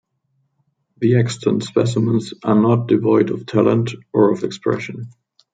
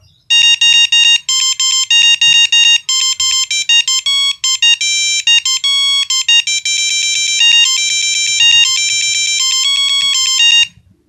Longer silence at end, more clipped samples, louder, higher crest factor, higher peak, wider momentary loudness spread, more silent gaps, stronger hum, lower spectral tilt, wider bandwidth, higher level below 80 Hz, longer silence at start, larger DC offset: about the same, 0.45 s vs 0.4 s; neither; second, -18 LUFS vs -8 LUFS; about the same, 16 dB vs 12 dB; about the same, -2 dBFS vs 0 dBFS; about the same, 7 LU vs 5 LU; neither; neither; first, -7.5 dB/octave vs 6 dB/octave; second, 9.2 kHz vs 16.5 kHz; about the same, -62 dBFS vs -62 dBFS; first, 1 s vs 0.3 s; neither